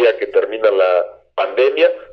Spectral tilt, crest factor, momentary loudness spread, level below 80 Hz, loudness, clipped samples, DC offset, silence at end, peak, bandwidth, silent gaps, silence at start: -4.5 dB/octave; 12 dB; 7 LU; -62 dBFS; -16 LUFS; under 0.1%; under 0.1%; 0 s; -2 dBFS; 5.8 kHz; none; 0 s